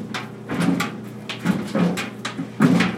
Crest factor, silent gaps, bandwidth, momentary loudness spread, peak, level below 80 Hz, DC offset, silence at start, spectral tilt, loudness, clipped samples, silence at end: 22 dB; none; 16 kHz; 12 LU; 0 dBFS; -58 dBFS; under 0.1%; 0 s; -6 dB/octave; -23 LUFS; under 0.1%; 0 s